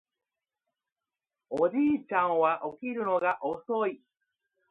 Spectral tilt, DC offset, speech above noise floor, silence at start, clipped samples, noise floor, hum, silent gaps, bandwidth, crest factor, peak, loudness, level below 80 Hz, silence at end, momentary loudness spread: -7.5 dB/octave; under 0.1%; over 62 dB; 1.5 s; under 0.1%; under -90 dBFS; none; none; 5.4 kHz; 18 dB; -12 dBFS; -29 LUFS; -74 dBFS; 0.75 s; 8 LU